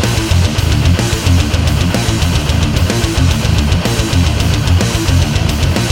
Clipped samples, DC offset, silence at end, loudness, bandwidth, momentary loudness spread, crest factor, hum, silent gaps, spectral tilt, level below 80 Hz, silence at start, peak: under 0.1%; under 0.1%; 0 s; -13 LUFS; 17 kHz; 1 LU; 12 dB; none; none; -5 dB/octave; -18 dBFS; 0 s; 0 dBFS